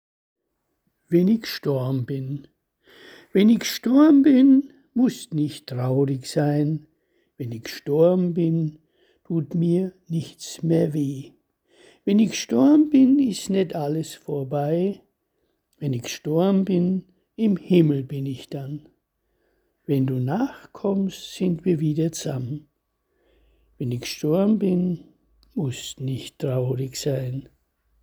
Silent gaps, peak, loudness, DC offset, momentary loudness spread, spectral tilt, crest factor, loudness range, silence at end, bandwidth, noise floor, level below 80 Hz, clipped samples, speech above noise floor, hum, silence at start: none; -4 dBFS; -22 LUFS; under 0.1%; 15 LU; -7 dB/octave; 18 dB; 7 LU; 0.6 s; over 20 kHz; -76 dBFS; -62 dBFS; under 0.1%; 55 dB; none; 1.1 s